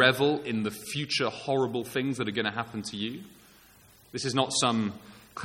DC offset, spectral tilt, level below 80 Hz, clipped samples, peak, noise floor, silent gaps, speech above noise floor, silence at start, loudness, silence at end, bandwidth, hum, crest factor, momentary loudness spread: under 0.1%; -4 dB/octave; -66 dBFS; under 0.1%; -4 dBFS; -57 dBFS; none; 28 dB; 0 s; -29 LUFS; 0 s; 17 kHz; none; 26 dB; 11 LU